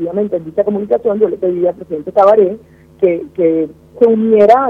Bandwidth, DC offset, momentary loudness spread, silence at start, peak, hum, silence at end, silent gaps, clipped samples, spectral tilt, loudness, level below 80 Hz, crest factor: 6.8 kHz; under 0.1%; 8 LU; 0 s; 0 dBFS; none; 0 s; none; 0.2%; -9 dB/octave; -13 LUFS; -52 dBFS; 12 dB